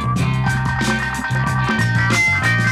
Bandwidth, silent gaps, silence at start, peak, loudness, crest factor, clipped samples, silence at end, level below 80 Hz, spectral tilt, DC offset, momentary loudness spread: 14.5 kHz; none; 0 s; -6 dBFS; -17 LUFS; 12 dB; under 0.1%; 0 s; -34 dBFS; -5 dB/octave; under 0.1%; 5 LU